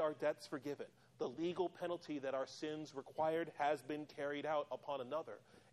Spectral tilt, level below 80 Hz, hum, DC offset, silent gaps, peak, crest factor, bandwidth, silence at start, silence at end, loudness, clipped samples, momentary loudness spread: -5.5 dB/octave; -86 dBFS; none; under 0.1%; none; -26 dBFS; 16 dB; 13 kHz; 0 s; 0.15 s; -43 LUFS; under 0.1%; 9 LU